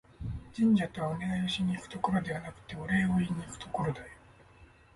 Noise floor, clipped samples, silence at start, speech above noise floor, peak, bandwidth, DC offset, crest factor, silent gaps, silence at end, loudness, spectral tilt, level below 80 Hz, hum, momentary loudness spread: -58 dBFS; under 0.1%; 0.2 s; 26 dB; -16 dBFS; 11.5 kHz; under 0.1%; 16 dB; none; 0.3 s; -32 LUFS; -6.5 dB/octave; -52 dBFS; none; 15 LU